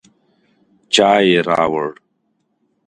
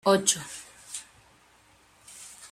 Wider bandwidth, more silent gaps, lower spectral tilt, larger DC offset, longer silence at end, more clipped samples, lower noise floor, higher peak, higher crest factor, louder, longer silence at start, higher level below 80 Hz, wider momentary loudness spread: second, 11 kHz vs 16 kHz; neither; first, -4 dB/octave vs -2.5 dB/octave; neither; first, 0.95 s vs 0.05 s; neither; first, -67 dBFS vs -60 dBFS; first, 0 dBFS vs -8 dBFS; about the same, 18 dB vs 22 dB; first, -15 LUFS vs -28 LUFS; first, 0.9 s vs 0.05 s; first, -58 dBFS vs -70 dBFS; second, 11 LU vs 22 LU